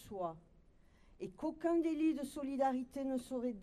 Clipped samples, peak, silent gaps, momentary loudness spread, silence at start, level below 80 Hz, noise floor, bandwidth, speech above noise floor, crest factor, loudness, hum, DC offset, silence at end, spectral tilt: under 0.1%; -24 dBFS; none; 11 LU; 0 s; -66 dBFS; -65 dBFS; 13.5 kHz; 27 dB; 16 dB; -38 LUFS; none; under 0.1%; 0 s; -6 dB/octave